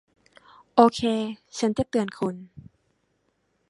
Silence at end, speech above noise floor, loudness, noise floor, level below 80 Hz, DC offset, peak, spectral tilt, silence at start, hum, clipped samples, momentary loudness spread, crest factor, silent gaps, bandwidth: 1.1 s; 48 dB; -24 LUFS; -71 dBFS; -58 dBFS; under 0.1%; -2 dBFS; -5.5 dB/octave; 0.75 s; none; under 0.1%; 12 LU; 24 dB; none; 11.5 kHz